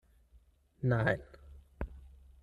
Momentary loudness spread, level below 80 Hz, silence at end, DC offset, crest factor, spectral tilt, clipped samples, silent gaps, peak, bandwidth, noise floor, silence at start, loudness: 25 LU; -52 dBFS; 0.35 s; under 0.1%; 22 dB; -8.5 dB/octave; under 0.1%; none; -16 dBFS; 6.6 kHz; -65 dBFS; 0.8 s; -35 LUFS